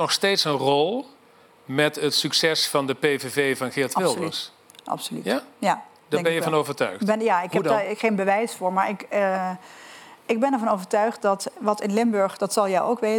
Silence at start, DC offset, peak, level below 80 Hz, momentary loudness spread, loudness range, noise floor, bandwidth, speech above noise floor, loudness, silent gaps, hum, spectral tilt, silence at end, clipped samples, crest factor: 0 s; under 0.1%; -4 dBFS; -84 dBFS; 9 LU; 3 LU; -54 dBFS; 19.5 kHz; 31 dB; -23 LUFS; none; none; -4 dB/octave; 0 s; under 0.1%; 20 dB